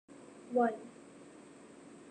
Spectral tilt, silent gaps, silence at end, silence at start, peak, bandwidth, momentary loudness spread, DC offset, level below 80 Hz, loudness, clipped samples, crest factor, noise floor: -6 dB/octave; none; 0 s; 0.1 s; -18 dBFS; 9.6 kHz; 23 LU; under 0.1%; -84 dBFS; -35 LUFS; under 0.1%; 22 dB; -55 dBFS